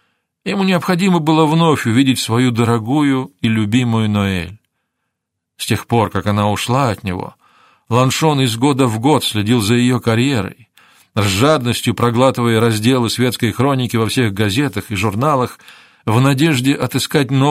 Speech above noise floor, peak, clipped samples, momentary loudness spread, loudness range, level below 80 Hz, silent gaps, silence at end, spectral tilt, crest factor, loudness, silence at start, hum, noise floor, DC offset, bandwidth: 62 dB; 0 dBFS; under 0.1%; 7 LU; 4 LU; -50 dBFS; none; 0 s; -5.5 dB/octave; 16 dB; -15 LUFS; 0.45 s; none; -76 dBFS; under 0.1%; 16 kHz